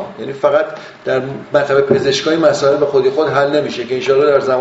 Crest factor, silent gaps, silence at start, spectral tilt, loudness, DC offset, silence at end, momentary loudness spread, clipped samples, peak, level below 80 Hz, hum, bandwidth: 14 dB; none; 0 s; -3.5 dB/octave; -14 LUFS; under 0.1%; 0 s; 7 LU; under 0.1%; 0 dBFS; -54 dBFS; none; 8 kHz